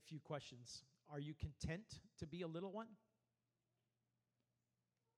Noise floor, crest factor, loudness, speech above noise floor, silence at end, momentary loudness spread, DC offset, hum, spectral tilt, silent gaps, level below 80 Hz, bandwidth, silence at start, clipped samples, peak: under -90 dBFS; 20 dB; -52 LUFS; over 38 dB; 2.2 s; 9 LU; under 0.1%; none; -5.5 dB/octave; none; -68 dBFS; 12.5 kHz; 0 s; under 0.1%; -34 dBFS